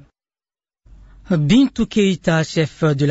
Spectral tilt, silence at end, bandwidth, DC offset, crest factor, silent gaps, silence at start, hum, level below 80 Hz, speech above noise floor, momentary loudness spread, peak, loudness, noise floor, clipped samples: -6.5 dB/octave; 0 s; 8 kHz; under 0.1%; 16 dB; none; 1.3 s; none; -42 dBFS; over 74 dB; 6 LU; -4 dBFS; -17 LUFS; under -90 dBFS; under 0.1%